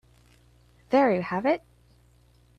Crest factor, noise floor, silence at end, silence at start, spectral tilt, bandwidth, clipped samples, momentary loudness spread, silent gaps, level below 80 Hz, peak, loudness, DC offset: 18 dB; -59 dBFS; 1 s; 0.9 s; -7.5 dB/octave; 9.2 kHz; under 0.1%; 6 LU; none; -62 dBFS; -10 dBFS; -25 LUFS; under 0.1%